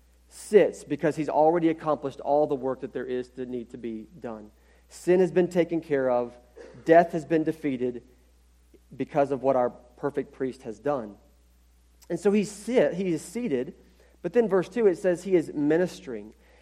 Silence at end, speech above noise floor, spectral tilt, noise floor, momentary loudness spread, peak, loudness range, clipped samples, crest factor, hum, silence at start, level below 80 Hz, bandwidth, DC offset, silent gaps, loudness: 0.3 s; 34 dB; -6.5 dB/octave; -59 dBFS; 16 LU; -6 dBFS; 5 LU; under 0.1%; 20 dB; none; 0.35 s; -60 dBFS; 14 kHz; under 0.1%; none; -26 LUFS